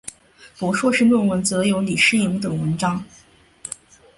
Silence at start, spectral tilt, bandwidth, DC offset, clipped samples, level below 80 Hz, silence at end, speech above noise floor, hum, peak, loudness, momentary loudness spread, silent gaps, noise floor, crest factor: 0.05 s; -4.5 dB/octave; 11.5 kHz; under 0.1%; under 0.1%; -54 dBFS; 0.5 s; 30 dB; none; -4 dBFS; -19 LUFS; 18 LU; none; -48 dBFS; 16 dB